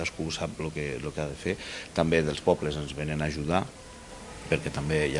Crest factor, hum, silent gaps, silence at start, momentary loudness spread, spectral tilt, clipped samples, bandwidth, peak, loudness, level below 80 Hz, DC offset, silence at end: 22 dB; none; none; 0 s; 15 LU; -5.5 dB/octave; under 0.1%; 11.5 kHz; -8 dBFS; -30 LUFS; -48 dBFS; under 0.1%; 0 s